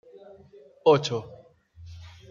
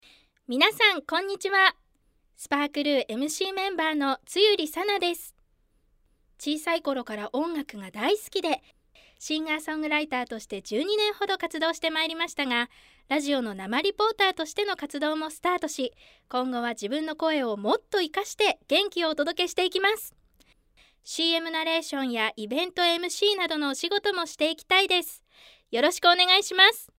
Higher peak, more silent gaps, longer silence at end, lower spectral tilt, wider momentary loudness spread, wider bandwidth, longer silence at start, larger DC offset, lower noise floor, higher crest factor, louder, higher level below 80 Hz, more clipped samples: about the same, -6 dBFS vs -4 dBFS; neither; about the same, 0.25 s vs 0.15 s; first, -5.5 dB/octave vs -1.5 dB/octave; first, 26 LU vs 11 LU; second, 7.6 kHz vs 16 kHz; first, 0.85 s vs 0.5 s; neither; second, -53 dBFS vs -67 dBFS; about the same, 22 dB vs 24 dB; about the same, -24 LUFS vs -25 LUFS; about the same, -62 dBFS vs -66 dBFS; neither